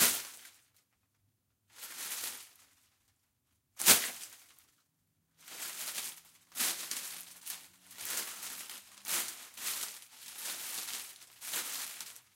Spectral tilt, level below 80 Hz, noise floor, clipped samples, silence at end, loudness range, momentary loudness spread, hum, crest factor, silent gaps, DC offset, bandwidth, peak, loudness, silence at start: 1 dB/octave; -84 dBFS; -78 dBFS; under 0.1%; 0.15 s; 7 LU; 20 LU; none; 34 dB; none; under 0.1%; 17 kHz; -6 dBFS; -34 LUFS; 0 s